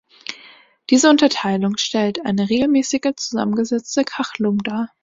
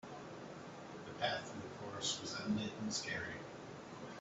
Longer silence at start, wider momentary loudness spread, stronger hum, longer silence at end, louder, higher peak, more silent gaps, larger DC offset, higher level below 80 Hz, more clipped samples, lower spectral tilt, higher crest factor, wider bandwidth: first, 0.3 s vs 0.05 s; first, 15 LU vs 11 LU; neither; first, 0.15 s vs 0 s; first, -18 LUFS vs -43 LUFS; first, -2 dBFS vs -24 dBFS; neither; neither; first, -58 dBFS vs -74 dBFS; neither; about the same, -4 dB/octave vs -3 dB/octave; about the same, 18 dB vs 22 dB; about the same, 7.8 kHz vs 8.2 kHz